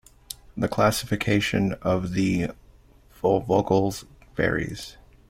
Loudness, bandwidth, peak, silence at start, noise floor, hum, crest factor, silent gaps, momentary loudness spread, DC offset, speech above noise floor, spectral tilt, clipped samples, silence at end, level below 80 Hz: -24 LUFS; 16.5 kHz; -6 dBFS; 0.3 s; -53 dBFS; none; 20 dB; none; 16 LU; under 0.1%; 30 dB; -5.5 dB/octave; under 0.1%; 0.35 s; -48 dBFS